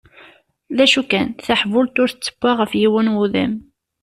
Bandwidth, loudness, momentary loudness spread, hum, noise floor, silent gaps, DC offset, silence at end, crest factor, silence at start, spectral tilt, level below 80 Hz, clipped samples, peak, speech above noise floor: 13.5 kHz; -17 LUFS; 7 LU; none; -49 dBFS; none; under 0.1%; 0.4 s; 16 dB; 0.7 s; -4.5 dB/octave; -54 dBFS; under 0.1%; -2 dBFS; 32 dB